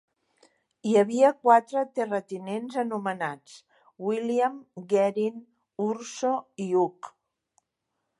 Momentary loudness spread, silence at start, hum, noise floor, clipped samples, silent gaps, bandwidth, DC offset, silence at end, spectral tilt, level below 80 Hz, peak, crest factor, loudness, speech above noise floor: 14 LU; 0.85 s; none; -81 dBFS; under 0.1%; none; 11.5 kHz; under 0.1%; 1.1 s; -5.5 dB/octave; -82 dBFS; -6 dBFS; 20 dB; -26 LUFS; 56 dB